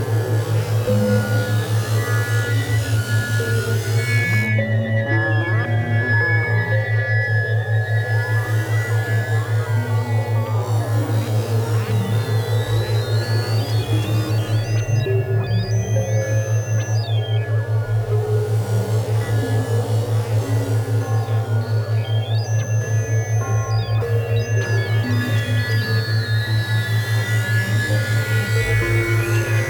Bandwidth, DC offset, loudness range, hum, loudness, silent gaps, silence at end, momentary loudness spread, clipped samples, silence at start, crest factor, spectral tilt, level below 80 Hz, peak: 18.5 kHz; under 0.1%; 2 LU; none; -20 LUFS; none; 0 s; 2 LU; under 0.1%; 0 s; 12 dB; -6 dB/octave; -44 dBFS; -6 dBFS